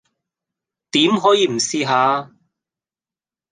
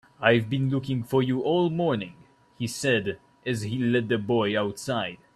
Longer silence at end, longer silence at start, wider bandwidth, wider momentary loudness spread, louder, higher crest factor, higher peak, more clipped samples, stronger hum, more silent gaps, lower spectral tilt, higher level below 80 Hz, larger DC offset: first, 1.25 s vs 0.2 s; first, 0.95 s vs 0.2 s; second, 10 kHz vs 13.5 kHz; second, 6 LU vs 9 LU; first, -17 LUFS vs -26 LUFS; about the same, 18 dB vs 22 dB; about the same, -2 dBFS vs -4 dBFS; neither; neither; neither; second, -3.5 dB/octave vs -6 dB/octave; second, -70 dBFS vs -62 dBFS; neither